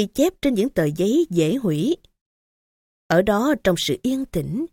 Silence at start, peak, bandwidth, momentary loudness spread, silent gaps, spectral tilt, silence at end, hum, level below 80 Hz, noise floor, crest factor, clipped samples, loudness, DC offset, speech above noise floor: 0 s; -4 dBFS; 17 kHz; 6 LU; 2.21-3.10 s; -5.5 dB/octave; 0.05 s; none; -48 dBFS; under -90 dBFS; 18 dB; under 0.1%; -21 LUFS; under 0.1%; over 70 dB